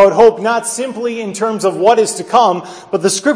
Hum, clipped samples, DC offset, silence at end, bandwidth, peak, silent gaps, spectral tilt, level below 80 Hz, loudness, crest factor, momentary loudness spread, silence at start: none; under 0.1%; under 0.1%; 0 s; 11 kHz; 0 dBFS; none; -3.5 dB/octave; -54 dBFS; -14 LUFS; 12 dB; 10 LU; 0 s